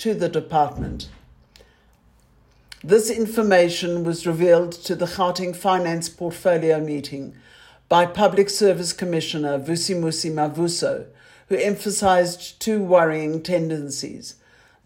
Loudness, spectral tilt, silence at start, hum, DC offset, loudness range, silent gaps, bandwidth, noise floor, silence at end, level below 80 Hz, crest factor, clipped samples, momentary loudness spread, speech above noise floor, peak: -21 LUFS; -4.5 dB/octave; 0 s; none; under 0.1%; 3 LU; none; 16.5 kHz; -56 dBFS; 0.55 s; -50 dBFS; 18 dB; under 0.1%; 12 LU; 36 dB; -4 dBFS